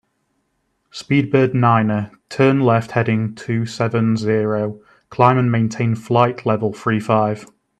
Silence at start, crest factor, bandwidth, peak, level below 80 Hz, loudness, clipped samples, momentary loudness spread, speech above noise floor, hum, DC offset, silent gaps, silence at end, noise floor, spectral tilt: 0.95 s; 18 dB; 9.4 kHz; 0 dBFS; -58 dBFS; -18 LUFS; under 0.1%; 9 LU; 52 dB; none; under 0.1%; none; 0.35 s; -69 dBFS; -7.5 dB/octave